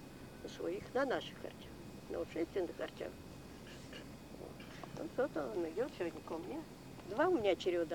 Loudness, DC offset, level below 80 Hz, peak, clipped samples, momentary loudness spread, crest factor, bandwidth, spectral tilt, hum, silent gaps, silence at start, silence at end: -40 LUFS; under 0.1%; -64 dBFS; -22 dBFS; under 0.1%; 17 LU; 20 dB; 19 kHz; -5.5 dB/octave; none; none; 0 s; 0 s